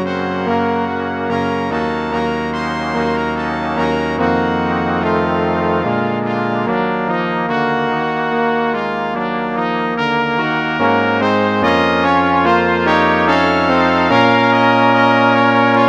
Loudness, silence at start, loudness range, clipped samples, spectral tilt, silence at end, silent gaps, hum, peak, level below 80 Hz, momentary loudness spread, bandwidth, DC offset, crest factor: -15 LUFS; 0 s; 6 LU; under 0.1%; -6.5 dB/octave; 0 s; none; none; 0 dBFS; -44 dBFS; 7 LU; 8.8 kHz; 0.1%; 16 dB